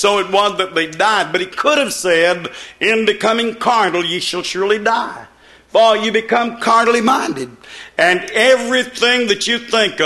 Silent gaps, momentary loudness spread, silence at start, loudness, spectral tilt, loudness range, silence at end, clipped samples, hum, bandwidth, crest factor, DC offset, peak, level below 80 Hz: none; 7 LU; 0 s; -14 LUFS; -2.5 dB/octave; 2 LU; 0 s; under 0.1%; none; 13 kHz; 16 dB; under 0.1%; 0 dBFS; -56 dBFS